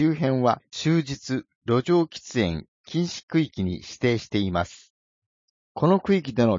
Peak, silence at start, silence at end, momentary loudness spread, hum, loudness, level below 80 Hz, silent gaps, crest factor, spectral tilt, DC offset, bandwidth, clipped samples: -6 dBFS; 0 s; 0 s; 9 LU; none; -25 LUFS; -54 dBFS; 1.55-1.61 s, 2.68-2.84 s, 3.23-3.28 s, 4.90-5.75 s; 18 dB; -6.5 dB/octave; under 0.1%; 7.6 kHz; under 0.1%